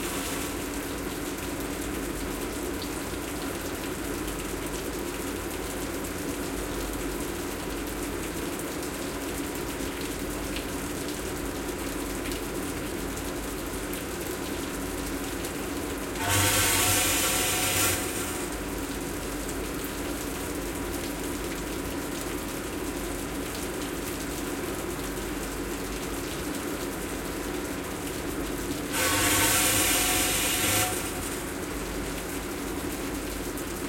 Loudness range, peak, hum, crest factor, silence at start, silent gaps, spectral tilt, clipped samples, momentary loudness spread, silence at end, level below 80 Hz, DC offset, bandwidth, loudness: 8 LU; -10 dBFS; none; 20 dB; 0 s; none; -3 dB/octave; under 0.1%; 10 LU; 0 s; -42 dBFS; under 0.1%; 17 kHz; -29 LUFS